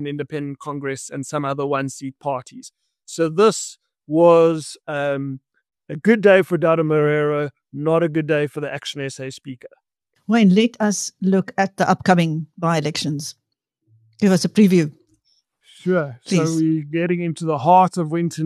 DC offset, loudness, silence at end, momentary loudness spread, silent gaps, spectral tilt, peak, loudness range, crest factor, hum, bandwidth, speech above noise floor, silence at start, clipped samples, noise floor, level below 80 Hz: under 0.1%; -19 LUFS; 0 s; 15 LU; none; -6 dB/octave; -2 dBFS; 5 LU; 18 dB; none; 13 kHz; 50 dB; 0 s; under 0.1%; -69 dBFS; -66 dBFS